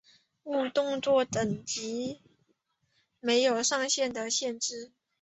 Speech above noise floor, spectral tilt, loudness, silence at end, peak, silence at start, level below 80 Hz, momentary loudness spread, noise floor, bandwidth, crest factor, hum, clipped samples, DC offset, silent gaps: 45 dB; -2.5 dB/octave; -29 LUFS; 0.35 s; -12 dBFS; 0.45 s; -70 dBFS; 11 LU; -75 dBFS; 8.4 kHz; 18 dB; none; under 0.1%; under 0.1%; none